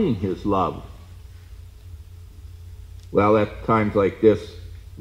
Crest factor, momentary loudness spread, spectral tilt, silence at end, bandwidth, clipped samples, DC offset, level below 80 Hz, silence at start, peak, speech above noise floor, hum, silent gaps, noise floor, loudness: 20 dB; 25 LU; -8 dB/octave; 0 s; 12.5 kHz; under 0.1%; under 0.1%; -42 dBFS; 0 s; -4 dBFS; 21 dB; none; none; -42 dBFS; -21 LUFS